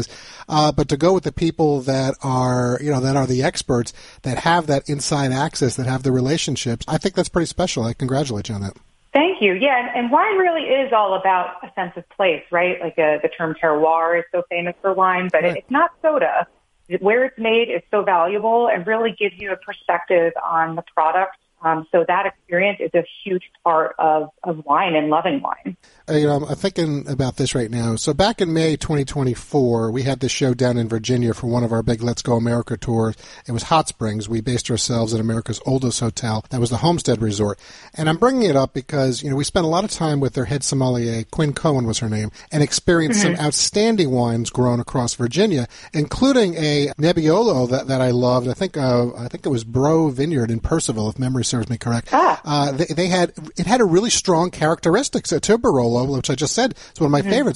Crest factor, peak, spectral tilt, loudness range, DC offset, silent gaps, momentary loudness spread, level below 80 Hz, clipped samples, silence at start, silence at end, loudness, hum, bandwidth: 18 dB; 0 dBFS; -5 dB/octave; 3 LU; under 0.1%; none; 7 LU; -44 dBFS; under 0.1%; 0 s; 0 s; -19 LUFS; none; 11.5 kHz